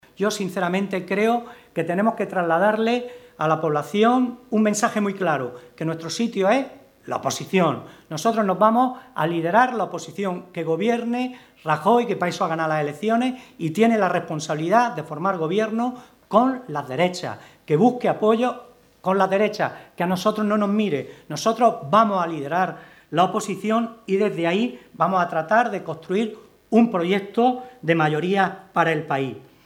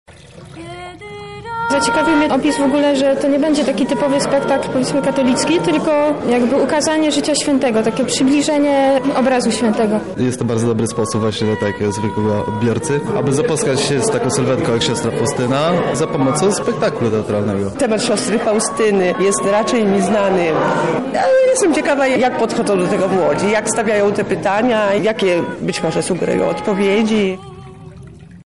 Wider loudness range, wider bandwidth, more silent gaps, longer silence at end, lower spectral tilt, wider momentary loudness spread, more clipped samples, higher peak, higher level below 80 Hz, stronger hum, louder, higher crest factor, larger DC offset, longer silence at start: about the same, 2 LU vs 3 LU; first, 16 kHz vs 11.5 kHz; neither; first, 0.25 s vs 0.05 s; about the same, -5.5 dB/octave vs -5 dB/octave; first, 10 LU vs 4 LU; neither; first, -2 dBFS vs -6 dBFS; second, -68 dBFS vs -48 dBFS; neither; second, -22 LUFS vs -16 LUFS; first, 20 dB vs 10 dB; second, under 0.1% vs 0.4%; about the same, 0.2 s vs 0.1 s